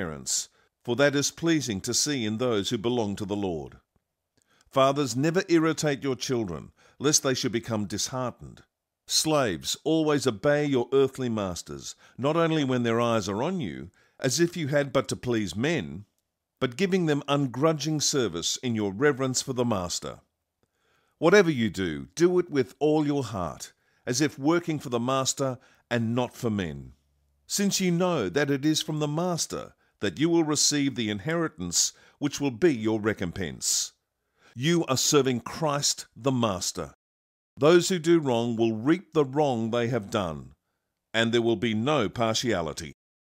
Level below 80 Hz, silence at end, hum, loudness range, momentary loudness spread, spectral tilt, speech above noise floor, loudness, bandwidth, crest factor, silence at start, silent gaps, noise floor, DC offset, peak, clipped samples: -60 dBFS; 0.4 s; none; 3 LU; 10 LU; -4 dB/octave; 54 dB; -26 LUFS; 16 kHz; 20 dB; 0 s; 36.95-37.57 s; -80 dBFS; under 0.1%; -6 dBFS; under 0.1%